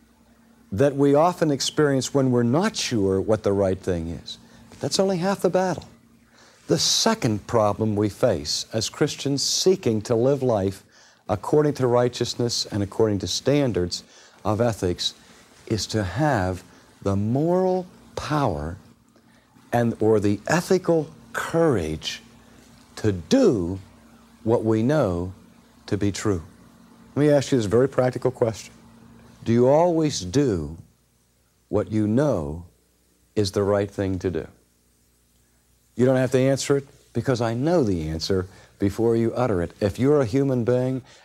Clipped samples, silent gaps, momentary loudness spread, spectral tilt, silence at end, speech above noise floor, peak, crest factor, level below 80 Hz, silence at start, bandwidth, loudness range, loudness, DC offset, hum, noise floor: under 0.1%; none; 12 LU; -5.5 dB/octave; 0.25 s; 42 dB; -4 dBFS; 18 dB; -50 dBFS; 0.7 s; 15.5 kHz; 4 LU; -23 LUFS; under 0.1%; none; -63 dBFS